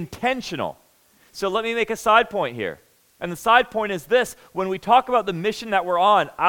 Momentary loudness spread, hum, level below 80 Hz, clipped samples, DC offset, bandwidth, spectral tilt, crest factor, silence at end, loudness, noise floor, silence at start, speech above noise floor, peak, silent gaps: 12 LU; none; -56 dBFS; under 0.1%; under 0.1%; 18 kHz; -4 dB/octave; 20 dB; 0 s; -21 LUFS; -57 dBFS; 0 s; 36 dB; -2 dBFS; none